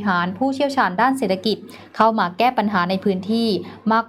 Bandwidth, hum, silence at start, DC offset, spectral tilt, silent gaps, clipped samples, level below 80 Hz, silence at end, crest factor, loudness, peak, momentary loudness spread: 15 kHz; none; 0 s; under 0.1%; -6 dB/octave; none; under 0.1%; -66 dBFS; 0 s; 16 dB; -20 LUFS; -4 dBFS; 5 LU